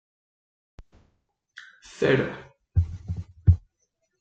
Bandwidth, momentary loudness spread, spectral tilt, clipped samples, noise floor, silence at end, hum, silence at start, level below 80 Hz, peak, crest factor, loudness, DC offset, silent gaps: 7.8 kHz; 23 LU; -7.5 dB/octave; under 0.1%; -75 dBFS; 0.6 s; none; 0.8 s; -40 dBFS; -6 dBFS; 22 dB; -26 LUFS; under 0.1%; none